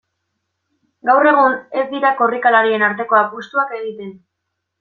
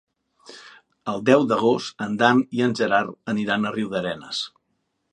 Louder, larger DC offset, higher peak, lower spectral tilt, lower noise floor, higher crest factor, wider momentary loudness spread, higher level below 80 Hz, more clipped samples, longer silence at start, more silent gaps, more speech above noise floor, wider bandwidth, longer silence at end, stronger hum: first, -15 LUFS vs -22 LUFS; neither; about the same, -2 dBFS vs -2 dBFS; about the same, -6 dB/octave vs -5.5 dB/octave; about the same, -76 dBFS vs -73 dBFS; second, 16 dB vs 22 dB; about the same, 13 LU vs 11 LU; about the same, -70 dBFS vs -66 dBFS; neither; first, 1.05 s vs 0.5 s; neither; first, 60 dB vs 52 dB; second, 7 kHz vs 10.5 kHz; about the same, 0.65 s vs 0.65 s; neither